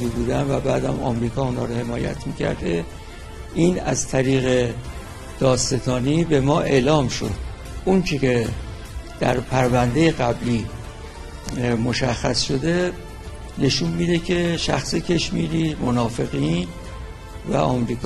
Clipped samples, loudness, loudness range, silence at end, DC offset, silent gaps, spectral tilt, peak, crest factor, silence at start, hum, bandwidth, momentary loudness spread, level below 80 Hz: under 0.1%; -21 LUFS; 3 LU; 0 s; under 0.1%; none; -5.5 dB/octave; -2 dBFS; 18 dB; 0 s; none; 13 kHz; 17 LU; -36 dBFS